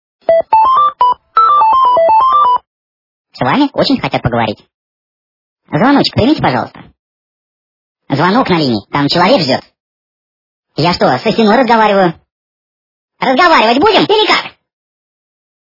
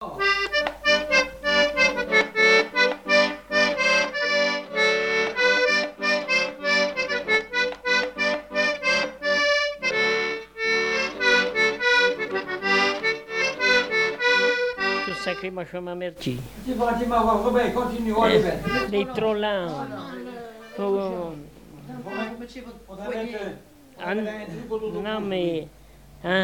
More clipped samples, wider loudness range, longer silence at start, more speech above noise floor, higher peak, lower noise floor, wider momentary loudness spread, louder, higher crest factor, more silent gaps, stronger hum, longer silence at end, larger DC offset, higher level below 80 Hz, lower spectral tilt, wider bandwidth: first, 0.1% vs under 0.1%; second, 5 LU vs 12 LU; first, 0.3 s vs 0 s; first, over 80 dB vs 18 dB; first, 0 dBFS vs -6 dBFS; first, under -90 dBFS vs -43 dBFS; second, 9 LU vs 14 LU; first, -10 LUFS vs -22 LUFS; second, 12 dB vs 18 dB; first, 2.67-3.25 s, 4.74-5.56 s, 6.99-7.95 s, 9.80-10.63 s, 12.32-13.09 s vs none; neither; first, 1.3 s vs 0 s; neither; first, -44 dBFS vs -50 dBFS; first, -6 dB/octave vs -3.5 dB/octave; second, 6 kHz vs 19.5 kHz